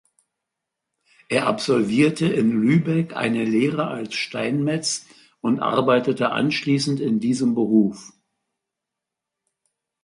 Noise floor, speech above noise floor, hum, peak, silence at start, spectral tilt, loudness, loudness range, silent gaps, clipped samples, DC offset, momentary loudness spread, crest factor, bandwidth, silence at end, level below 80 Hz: -85 dBFS; 64 dB; none; -4 dBFS; 1.3 s; -5.5 dB/octave; -21 LUFS; 2 LU; none; under 0.1%; under 0.1%; 7 LU; 18 dB; 11.5 kHz; 1.95 s; -64 dBFS